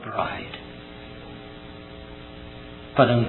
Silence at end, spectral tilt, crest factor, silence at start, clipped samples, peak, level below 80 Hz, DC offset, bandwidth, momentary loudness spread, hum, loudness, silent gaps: 0 s; -10.5 dB/octave; 26 dB; 0 s; under 0.1%; -2 dBFS; -50 dBFS; under 0.1%; 4.2 kHz; 17 LU; none; -26 LUFS; none